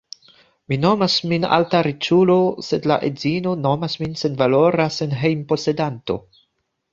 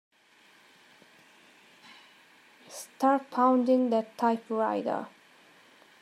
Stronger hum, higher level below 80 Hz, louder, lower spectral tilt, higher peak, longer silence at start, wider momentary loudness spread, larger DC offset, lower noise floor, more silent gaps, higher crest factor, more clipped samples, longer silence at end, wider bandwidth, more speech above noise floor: neither; first, -56 dBFS vs -90 dBFS; first, -19 LUFS vs -27 LUFS; about the same, -6.5 dB/octave vs -5.5 dB/octave; first, 0 dBFS vs -12 dBFS; second, 0.7 s vs 2.7 s; second, 8 LU vs 20 LU; neither; first, -70 dBFS vs -61 dBFS; neither; about the same, 18 dB vs 18 dB; neither; second, 0.75 s vs 0.95 s; second, 7.6 kHz vs 15 kHz; first, 52 dB vs 34 dB